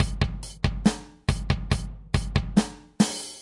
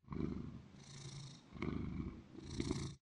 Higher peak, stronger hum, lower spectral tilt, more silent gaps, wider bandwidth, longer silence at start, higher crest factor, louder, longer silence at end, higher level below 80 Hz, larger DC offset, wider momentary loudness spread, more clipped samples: first, -6 dBFS vs -24 dBFS; neither; about the same, -5.5 dB/octave vs -6 dB/octave; neither; about the same, 11.5 kHz vs 11.5 kHz; about the same, 0 s vs 0.05 s; about the same, 20 dB vs 22 dB; first, -27 LUFS vs -47 LUFS; about the same, 0 s vs 0.05 s; first, -34 dBFS vs -56 dBFS; neither; second, 5 LU vs 11 LU; neither